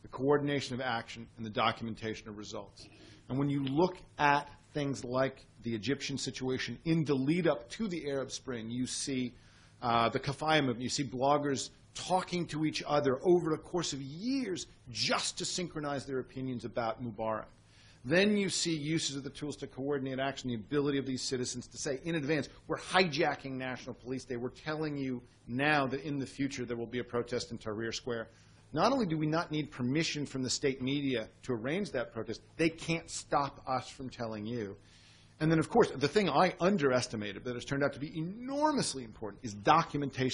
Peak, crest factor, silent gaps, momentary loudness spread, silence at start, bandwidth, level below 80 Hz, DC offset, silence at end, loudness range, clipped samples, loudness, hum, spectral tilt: -10 dBFS; 24 dB; none; 12 LU; 0.05 s; 10.5 kHz; -62 dBFS; under 0.1%; 0 s; 4 LU; under 0.1%; -33 LUFS; none; -4.5 dB/octave